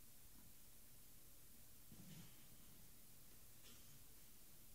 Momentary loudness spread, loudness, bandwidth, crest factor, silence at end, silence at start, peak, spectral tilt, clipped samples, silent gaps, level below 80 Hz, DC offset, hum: 3 LU; -64 LUFS; 16 kHz; 18 dB; 0 s; 0 s; -46 dBFS; -3 dB/octave; under 0.1%; none; -74 dBFS; under 0.1%; none